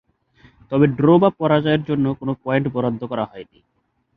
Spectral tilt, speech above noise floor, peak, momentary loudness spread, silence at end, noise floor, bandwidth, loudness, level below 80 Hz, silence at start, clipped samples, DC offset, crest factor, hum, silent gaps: -10.5 dB/octave; 35 dB; -2 dBFS; 12 LU; 0.75 s; -54 dBFS; 4.8 kHz; -19 LUFS; -54 dBFS; 0.7 s; under 0.1%; under 0.1%; 18 dB; none; none